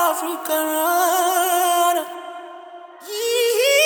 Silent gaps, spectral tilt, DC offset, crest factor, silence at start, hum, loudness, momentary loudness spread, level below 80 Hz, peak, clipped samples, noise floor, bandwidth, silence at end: none; 1.5 dB/octave; under 0.1%; 14 dB; 0 s; none; -19 LUFS; 20 LU; under -90 dBFS; -6 dBFS; under 0.1%; -39 dBFS; 19.5 kHz; 0 s